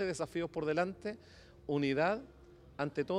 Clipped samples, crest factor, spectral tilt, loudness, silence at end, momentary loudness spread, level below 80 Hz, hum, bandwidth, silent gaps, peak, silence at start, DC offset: under 0.1%; 18 dB; -6 dB/octave; -36 LUFS; 0 s; 18 LU; -64 dBFS; none; 12 kHz; none; -18 dBFS; 0 s; under 0.1%